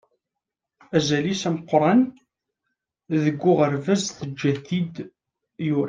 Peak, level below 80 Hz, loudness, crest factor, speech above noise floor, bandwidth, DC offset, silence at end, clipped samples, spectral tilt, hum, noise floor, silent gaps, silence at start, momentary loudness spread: -4 dBFS; -64 dBFS; -23 LUFS; 20 dB; 64 dB; 9.8 kHz; under 0.1%; 0 s; under 0.1%; -6 dB/octave; none; -85 dBFS; none; 0.9 s; 10 LU